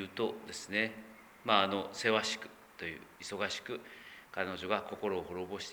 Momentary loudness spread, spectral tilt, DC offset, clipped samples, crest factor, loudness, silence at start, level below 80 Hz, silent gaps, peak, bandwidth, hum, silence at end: 15 LU; -3 dB/octave; under 0.1%; under 0.1%; 26 dB; -36 LUFS; 0 s; -72 dBFS; none; -12 dBFS; over 20 kHz; none; 0 s